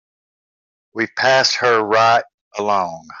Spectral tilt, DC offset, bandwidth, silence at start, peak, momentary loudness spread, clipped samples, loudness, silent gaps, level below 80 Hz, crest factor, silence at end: -2.5 dB/octave; under 0.1%; 7.8 kHz; 0.95 s; -2 dBFS; 13 LU; under 0.1%; -16 LUFS; 2.34-2.51 s; -68 dBFS; 16 dB; 0 s